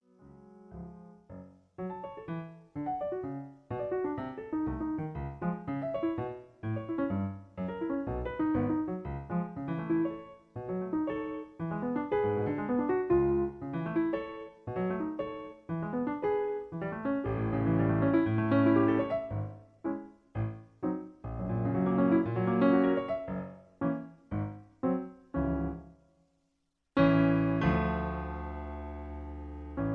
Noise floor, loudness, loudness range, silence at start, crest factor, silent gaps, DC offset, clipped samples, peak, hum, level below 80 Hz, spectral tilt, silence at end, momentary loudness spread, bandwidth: -79 dBFS; -32 LUFS; 7 LU; 0.25 s; 20 dB; none; under 0.1%; under 0.1%; -12 dBFS; none; -50 dBFS; -10.5 dB/octave; 0 s; 15 LU; 5.2 kHz